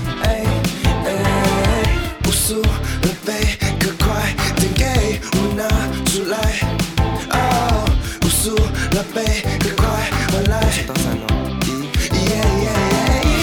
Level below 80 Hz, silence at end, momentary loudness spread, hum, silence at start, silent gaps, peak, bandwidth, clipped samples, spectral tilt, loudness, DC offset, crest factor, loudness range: -22 dBFS; 0 s; 4 LU; none; 0 s; none; -2 dBFS; over 20 kHz; under 0.1%; -4.5 dB/octave; -18 LUFS; under 0.1%; 14 dB; 1 LU